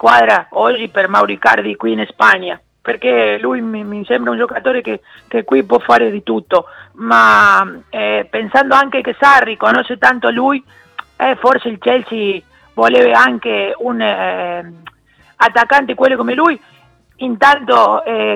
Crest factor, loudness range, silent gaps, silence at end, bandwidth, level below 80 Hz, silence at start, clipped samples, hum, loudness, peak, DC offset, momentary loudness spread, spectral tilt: 14 dB; 4 LU; none; 0 s; 13.5 kHz; -54 dBFS; 0.05 s; 0.4%; none; -12 LUFS; 0 dBFS; under 0.1%; 13 LU; -4.5 dB/octave